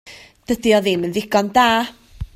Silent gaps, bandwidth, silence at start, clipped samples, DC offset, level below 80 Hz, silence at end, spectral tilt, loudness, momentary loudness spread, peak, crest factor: none; 16 kHz; 0.05 s; under 0.1%; under 0.1%; -42 dBFS; 0.1 s; -4.5 dB/octave; -17 LUFS; 11 LU; -2 dBFS; 16 dB